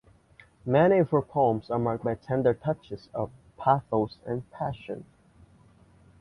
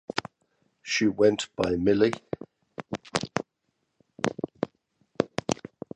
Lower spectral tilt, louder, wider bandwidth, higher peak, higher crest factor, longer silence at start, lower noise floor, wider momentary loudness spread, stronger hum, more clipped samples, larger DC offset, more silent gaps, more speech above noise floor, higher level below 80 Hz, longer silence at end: first, -9.5 dB/octave vs -4.5 dB/octave; about the same, -27 LUFS vs -28 LUFS; about the same, 10.5 kHz vs 10 kHz; second, -8 dBFS vs -4 dBFS; second, 20 dB vs 26 dB; first, 0.65 s vs 0.15 s; second, -58 dBFS vs -77 dBFS; about the same, 15 LU vs 17 LU; neither; neither; neither; neither; second, 31 dB vs 53 dB; about the same, -58 dBFS vs -56 dBFS; first, 1.2 s vs 0.4 s